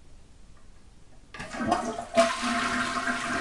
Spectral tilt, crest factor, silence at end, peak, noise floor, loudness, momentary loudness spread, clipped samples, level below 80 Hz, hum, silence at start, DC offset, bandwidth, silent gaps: -3 dB/octave; 22 dB; 0 s; -8 dBFS; -49 dBFS; -27 LUFS; 14 LU; under 0.1%; -52 dBFS; none; 0 s; under 0.1%; 11.5 kHz; none